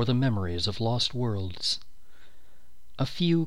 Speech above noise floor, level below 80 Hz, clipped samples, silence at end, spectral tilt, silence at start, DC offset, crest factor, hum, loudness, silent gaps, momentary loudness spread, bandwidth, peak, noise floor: 31 dB; -52 dBFS; under 0.1%; 0 s; -5.5 dB/octave; 0 s; 2%; 16 dB; none; -28 LUFS; none; 7 LU; 13 kHz; -12 dBFS; -58 dBFS